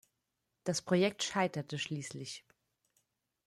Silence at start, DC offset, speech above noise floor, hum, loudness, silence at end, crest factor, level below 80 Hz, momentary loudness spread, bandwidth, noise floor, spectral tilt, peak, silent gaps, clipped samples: 0.65 s; under 0.1%; 50 dB; none; -35 LUFS; 1.05 s; 22 dB; -76 dBFS; 14 LU; 13.5 kHz; -85 dBFS; -4.5 dB/octave; -16 dBFS; none; under 0.1%